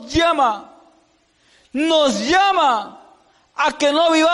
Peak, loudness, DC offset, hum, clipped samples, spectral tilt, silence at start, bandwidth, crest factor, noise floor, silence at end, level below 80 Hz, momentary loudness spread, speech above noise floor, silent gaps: -6 dBFS; -17 LUFS; under 0.1%; none; under 0.1%; -3 dB/octave; 0 s; 11.5 kHz; 12 dB; -59 dBFS; 0 s; -46 dBFS; 15 LU; 42 dB; none